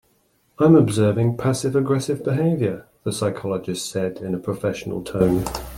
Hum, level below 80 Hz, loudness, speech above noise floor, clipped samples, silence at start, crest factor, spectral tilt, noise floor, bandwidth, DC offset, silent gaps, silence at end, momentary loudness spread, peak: none; -46 dBFS; -21 LUFS; 43 dB; under 0.1%; 0.6 s; 18 dB; -6.5 dB/octave; -63 dBFS; 17 kHz; under 0.1%; none; 0 s; 11 LU; -2 dBFS